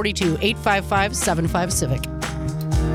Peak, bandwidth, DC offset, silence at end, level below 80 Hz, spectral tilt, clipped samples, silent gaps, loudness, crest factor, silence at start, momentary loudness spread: -6 dBFS; 17.5 kHz; under 0.1%; 0 s; -30 dBFS; -4.5 dB/octave; under 0.1%; none; -21 LUFS; 16 dB; 0 s; 7 LU